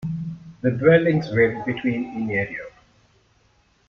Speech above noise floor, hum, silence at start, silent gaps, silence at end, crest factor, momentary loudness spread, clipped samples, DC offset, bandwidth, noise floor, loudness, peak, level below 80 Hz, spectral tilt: 41 dB; none; 0 s; none; 1.2 s; 20 dB; 16 LU; under 0.1%; under 0.1%; 6.6 kHz; -61 dBFS; -21 LUFS; -4 dBFS; -54 dBFS; -8.5 dB/octave